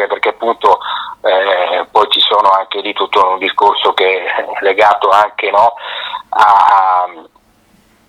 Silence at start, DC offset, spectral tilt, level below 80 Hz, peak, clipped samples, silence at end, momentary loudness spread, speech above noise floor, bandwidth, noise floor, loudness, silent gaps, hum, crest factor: 0 s; under 0.1%; -2.5 dB/octave; -58 dBFS; 0 dBFS; 0.3%; 0.85 s; 9 LU; 39 dB; 13.5 kHz; -50 dBFS; -11 LUFS; none; none; 12 dB